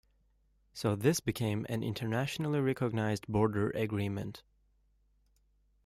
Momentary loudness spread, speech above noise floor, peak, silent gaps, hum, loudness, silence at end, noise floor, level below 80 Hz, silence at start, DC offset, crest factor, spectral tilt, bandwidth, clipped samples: 7 LU; 38 dB; -16 dBFS; none; 50 Hz at -55 dBFS; -33 LUFS; 1.45 s; -71 dBFS; -62 dBFS; 0.75 s; under 0.1%; 20 dB; -6 dB/octave; 15.5 kHz; under 0.1%